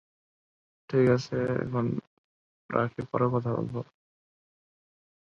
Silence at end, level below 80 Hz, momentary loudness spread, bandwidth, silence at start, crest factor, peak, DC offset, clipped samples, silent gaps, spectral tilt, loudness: 1.4 s; -62 dBFS; 12 LU; 7.4 kHz; 0.9 s; 22 dB; -10 dBFS; under 0.1%; under 0.1%; 2.07-2.69 s; -8 dB/octave; -29 LUFS